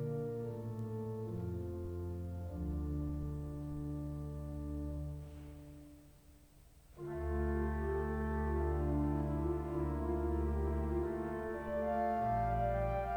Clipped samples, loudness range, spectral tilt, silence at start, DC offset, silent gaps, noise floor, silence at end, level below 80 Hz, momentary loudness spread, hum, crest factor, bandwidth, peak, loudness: under 0.1%; 8 LU; -9.5 dB/octave; 0 s; under 0.1%; none; -61 dBFS; 0 s; -44 dBFS; 9 LU; none; 14 dB; 18 kHz; -24 dBFS; -39 LUFS